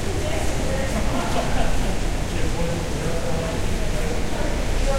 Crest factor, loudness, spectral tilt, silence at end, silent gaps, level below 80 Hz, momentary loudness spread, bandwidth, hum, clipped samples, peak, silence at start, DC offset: 14 dB; -25 LUFS; -5 dB/octave; 0 s; none; -26 dBFS; 2 LU; 16 kHz; none; under 0.1%; -6 dBFS; 0 s; under 0.1%